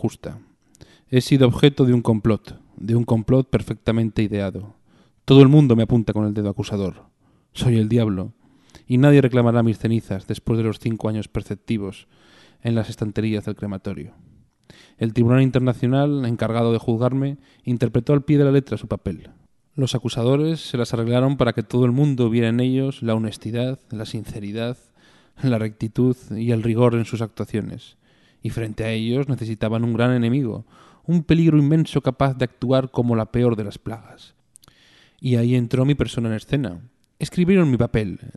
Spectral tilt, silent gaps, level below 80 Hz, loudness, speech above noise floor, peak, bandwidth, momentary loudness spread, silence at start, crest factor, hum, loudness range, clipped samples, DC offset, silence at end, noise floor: -8 dB/octave; none; -46 dBFS; -20 LUFS; 38 dB; 0 dBFS; 12 kHz; 14 LU; 0 s; 20 dB; none; 7 LU; under 0.1%; under 0.1%; 0.05 s; -57 dBFS